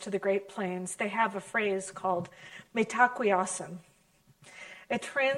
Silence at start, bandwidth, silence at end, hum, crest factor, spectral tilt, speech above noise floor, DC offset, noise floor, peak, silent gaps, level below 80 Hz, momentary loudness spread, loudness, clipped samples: 0 s; 13 kHz; 0 s; none; 20 dB; -4 dB/octave; 34 dB; under 0.1%; -65 dBFS; -10 dBFS; none; -74 dBFS; 20 LU; -30 LUFS; under 0.1%